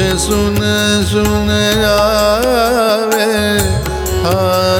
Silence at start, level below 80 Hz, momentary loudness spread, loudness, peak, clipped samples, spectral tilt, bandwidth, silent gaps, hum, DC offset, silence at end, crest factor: 0 s; -26 dBFS; 3 LU; -12 LUFS; 0 dBFS; under 0.1%; -4.5 dB/octave; 19.5 kHz; none; none; under 0.1%; 0 s; 12 dB